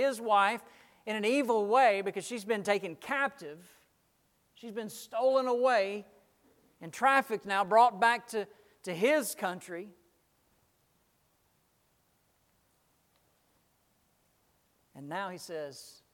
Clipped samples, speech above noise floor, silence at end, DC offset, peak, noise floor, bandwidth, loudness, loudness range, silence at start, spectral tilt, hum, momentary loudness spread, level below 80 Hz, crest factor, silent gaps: under 0.1%; 42 dB; 0.25 s; under 0.1%; -12 dBFS; -73 dBFS; 17.5 kHz; -30 LUFS; 16 LU; 0 s; -3.5 dB/octave; none; 20 LU; -82 dBFS; 22 dB; none